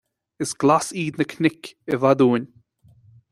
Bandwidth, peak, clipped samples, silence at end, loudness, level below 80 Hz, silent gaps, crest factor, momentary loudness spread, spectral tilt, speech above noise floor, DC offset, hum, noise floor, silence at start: 13.5 kHz; -2 dBFS; under 0.1%; 0.85 s; -21 LUFS; -64 dBFS; none; 20 dB; 13 LU; -5.5 dB/octave; 34 dB; under 0.1%; none; -55 dBFS; 0.4 s